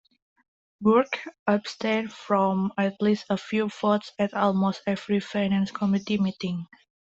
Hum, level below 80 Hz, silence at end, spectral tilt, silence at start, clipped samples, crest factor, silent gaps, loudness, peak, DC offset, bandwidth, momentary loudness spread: none; -66 dBFS; 0.5 s; -7 dB/octave; 0.8 s; under 0.1%; 18 dB; 1.39-1.46 s; -26 LUFS; -6 dBFS; under 0.1%; 7.8 kHz; 7 LU